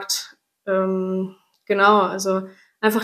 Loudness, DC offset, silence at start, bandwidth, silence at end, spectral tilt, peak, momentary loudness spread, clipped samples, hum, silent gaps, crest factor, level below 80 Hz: -21 LUFS; under 0.1%; 0 s; 15 kHz; 0 s; -4 dB/octave; -2 dBFS; 19 LU; under 0.1%; none; none; 20 dB; -74 dBFS